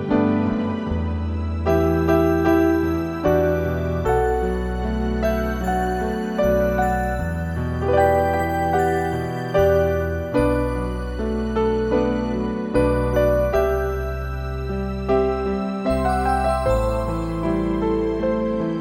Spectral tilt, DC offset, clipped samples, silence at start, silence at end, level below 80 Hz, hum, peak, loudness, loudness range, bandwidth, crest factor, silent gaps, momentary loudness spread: -7.5 dB/octave; under 0.1%; under 0.1%; 0 s; 0 s; -30 dBFS; none; -4 dBFS; -21 LUFS; 2 LU; 16.5 kHz; 16 dB; none; 7 LU